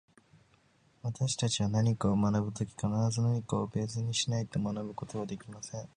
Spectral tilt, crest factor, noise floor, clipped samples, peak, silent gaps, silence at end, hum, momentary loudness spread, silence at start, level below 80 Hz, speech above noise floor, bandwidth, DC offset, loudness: -5.5 dB/octave; 18 dB; -67 dBFS; under 0.1%; -16 dBFS; none; 0.1 s; none; 12 LU; 1.05 s; -58 dBFS; 35 dB; 10.5 kHz; under 0.1%; -32 LUFS